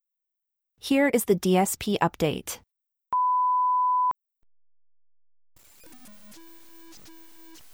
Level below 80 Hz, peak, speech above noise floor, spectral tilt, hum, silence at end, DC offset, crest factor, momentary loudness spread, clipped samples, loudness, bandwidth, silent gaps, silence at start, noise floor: -60 dBFS; -8 dBFS; 60 dB; -4.5 dB/octave; none; 0.2 s; under 0.1%; 20 dB; 14 LU; under 0.1%; -24 LUFS; over 20 kHz; none; 0.85 s; -84 dBFS